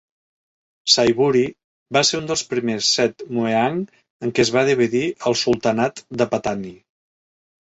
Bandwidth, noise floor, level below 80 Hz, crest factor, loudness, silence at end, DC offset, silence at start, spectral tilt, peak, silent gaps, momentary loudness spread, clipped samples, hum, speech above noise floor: 8.2 kHz; under -90 dBFS; -56 dBFS; 20 dB; -19 LUFS; 1 s; under 0.1%; 0.85 s; -3.5 dB/octave; 0 dBFS; 1.64-1.86 s, 4.10-4.20 s; 10 LU; under 0.1%; none; over 71 dB